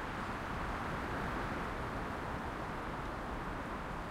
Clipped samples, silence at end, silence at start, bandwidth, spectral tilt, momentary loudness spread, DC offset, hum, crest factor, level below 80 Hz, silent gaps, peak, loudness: under 0.1%; 0 s; 0 s; 16.5 kHz; -6 dB/octave; 3 LU; under 0.1%; none; 14 dB; -48 dBFS; none; -26 dBFS; -40 LUFS